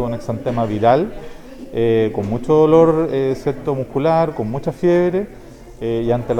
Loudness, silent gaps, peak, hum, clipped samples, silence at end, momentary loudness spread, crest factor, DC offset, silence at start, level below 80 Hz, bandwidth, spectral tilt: -17 LUFS; none; 0 dBFS; none; under 0.1%; 0 s; 14 LU; 16 dB; under 0.1%; 0 s; -40 dBFS; 9.8 kHz; -8.5 dB/octave